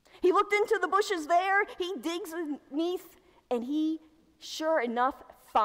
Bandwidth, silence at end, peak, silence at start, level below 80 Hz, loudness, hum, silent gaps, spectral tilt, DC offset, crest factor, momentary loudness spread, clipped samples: 16 kHz; 0 s; -14 dBFS; 0.15 s; -68 dBFS; -29 LUFS; none; none; -2.5 dB/octave; under 0.1%; 16 dB; 11 LU; under 0.1%